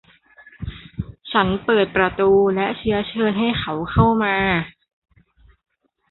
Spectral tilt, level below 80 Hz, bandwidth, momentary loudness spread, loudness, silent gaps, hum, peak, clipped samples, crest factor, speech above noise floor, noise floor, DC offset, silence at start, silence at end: -11 dB/octave; -40 dBFS; 4.3 kHz; 17 LU; -19 LUFS; none; none; -2 dBFS; under 0.1%; 20 dB; 36 dB; -54 dBFS; under 0.1%; 0.6 s; 1.4 s